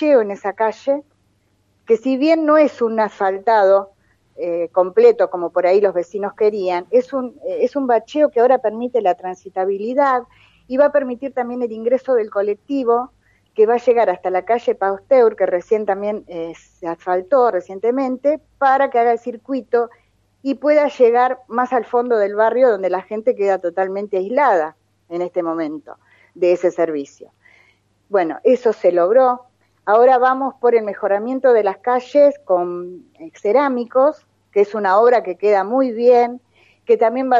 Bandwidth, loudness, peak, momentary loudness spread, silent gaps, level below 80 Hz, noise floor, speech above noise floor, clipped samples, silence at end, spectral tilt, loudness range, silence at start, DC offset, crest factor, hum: 7.4 kHz; -17 LUFS; -2 dBFS; 12 LU; none; -66 dBFS; -62 dBFS; 45 dB; under 0.1%; 0 s; -6.5 dB/octave; 4 LU; 0 s; under 0.1%; 16 dB; none